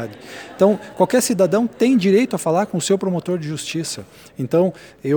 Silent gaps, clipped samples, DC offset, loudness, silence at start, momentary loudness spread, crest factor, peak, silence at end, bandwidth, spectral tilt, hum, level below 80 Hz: none; under 0.1%; under 0.1%; -19 LUFS; 0 s; 14 LU; 18 dB; -2 dBFS; 0 s; over 20 kHz; -5.5 dB/octave; none; -60 dBFS